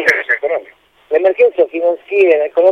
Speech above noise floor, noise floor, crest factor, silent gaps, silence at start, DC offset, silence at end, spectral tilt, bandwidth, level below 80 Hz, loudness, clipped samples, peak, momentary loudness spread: 32 dB; -43 dBFS; 14 dB; none; 0 s; under 0.1%; 0 s; -4 dB/octave; 9.6 kHz; -62 dBFS; -14 LUFS; under 0.1%; 0 dBFS; 7 LU